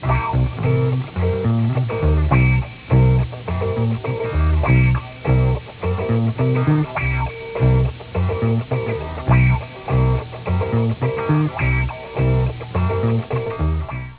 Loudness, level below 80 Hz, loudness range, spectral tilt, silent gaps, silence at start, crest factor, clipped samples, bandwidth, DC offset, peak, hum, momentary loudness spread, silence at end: -19 LUFS; -26 dBFS; 2 LU; -12 dB/octave; none; 0 s; 16 dB; under 0.1%; 4 kHz; under 0.1%; -2 dBFS; none; 8 LU; 0 s